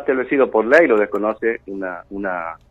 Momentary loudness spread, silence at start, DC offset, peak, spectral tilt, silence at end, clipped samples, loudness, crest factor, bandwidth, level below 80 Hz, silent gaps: 15 LU; 0 s; under 0.1%; 0 dBFS; -6.5 dB/octave; 0.15 s; under 0.1%; -18 LUFS; 18 dB; 8.4 kHz; -54 dBFS; none